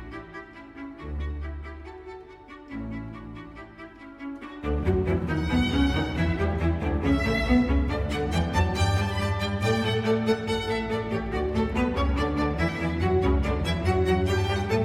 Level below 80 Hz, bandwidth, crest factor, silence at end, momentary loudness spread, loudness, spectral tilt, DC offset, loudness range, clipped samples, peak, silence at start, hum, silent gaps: -34 dBFS; 13.5 kHz; 16 dB; 0 s; 18 LU; -26 LUFS; -6.5 dB/octave; under 0.1%; 13 LU; under 0.1%; -10 dBFS; 0 s; none; none